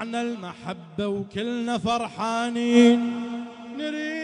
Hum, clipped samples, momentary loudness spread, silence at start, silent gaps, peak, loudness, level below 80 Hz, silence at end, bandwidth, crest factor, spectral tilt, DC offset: none; under 0.1%; 17 LU; 0 s; none; -6 dBFS; -24 LUFS; -62 dBFS; 0 s; 10.5 kHz; 18 dB; -5 dB/octave; under 0.1%